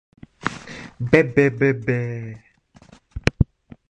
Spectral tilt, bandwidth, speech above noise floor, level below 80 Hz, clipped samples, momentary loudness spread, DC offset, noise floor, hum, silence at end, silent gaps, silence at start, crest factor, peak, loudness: -7 dB/octave; 10.5 kHz; 31 dB; -38 dBFS; under 0.1%; 19 LU; under 0.1%; -51 dBFS; none; 0.45 s; none; 0.45 s; 20 dB; -2 dBFS; -21 LUFS